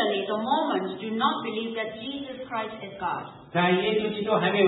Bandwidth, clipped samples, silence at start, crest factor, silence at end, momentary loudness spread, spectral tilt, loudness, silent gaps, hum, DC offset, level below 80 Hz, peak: 4.1 kHz; under 0.1%; 0 s; 18 dB; 0 s; 11 LU; -10 dB/octave; -27 LUFS; none; none; under 0.1%; -66 dBFS; -10 dBFS